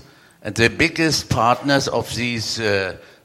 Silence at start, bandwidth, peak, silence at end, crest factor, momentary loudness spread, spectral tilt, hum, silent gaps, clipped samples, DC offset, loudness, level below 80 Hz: 0.45 s; 16 kHz; 0 dBFS; 0.25 s; 20 dB; 8 LU; -4 dB/octave; none; none; under 0.1%; under 0.1%; -19 LUFS; -46 dBFS